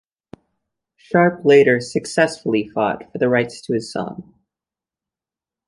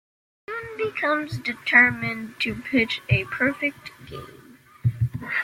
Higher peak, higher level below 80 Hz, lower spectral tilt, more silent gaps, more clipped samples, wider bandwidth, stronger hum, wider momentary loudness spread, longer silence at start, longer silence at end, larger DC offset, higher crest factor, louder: about the same, -2 dBFS vs -2 dBFS; second, -60 dBFS vs -52 dBFS; about the same, -5.5 dB/octave vs -6.5 dB/octave; neither; neither; second, 11.5 kHz vs 16 kHz; neither; second, 13 LU vs 20 LU; first, 1.15 s vs 0.5 s; first, 1.45 s vs 0 s; neither; about the same, 20 dB vs 22 dB; first, -18 LUFS vs -23 LUFS